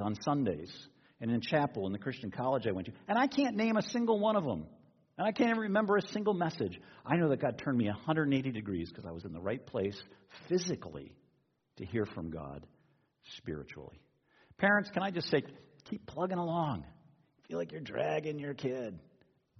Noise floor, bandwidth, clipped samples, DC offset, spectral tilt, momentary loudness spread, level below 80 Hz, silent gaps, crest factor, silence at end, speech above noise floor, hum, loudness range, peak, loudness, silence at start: -75 dBFS; 6.4 kHz; under 0.1%; under 0.1%; -5 dB/octave; 18 LU; -68 dBFS; none; 20 dB; 0.6 s; 41 dB; none; 8 LU; -16 dBFS; -34 LUFS; 0 s